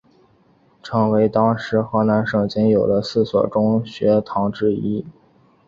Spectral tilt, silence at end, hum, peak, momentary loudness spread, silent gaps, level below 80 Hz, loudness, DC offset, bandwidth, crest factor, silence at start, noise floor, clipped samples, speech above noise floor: -8 dB/octave; 0.55 s; none; -2 dBFS; 6 LU; none; -52 dBFS; -19 LUFS; under 0.1%; 7.2 kHz; 16 dB; 0.85 s; -56 dBFS; under 0.1%; 38 dB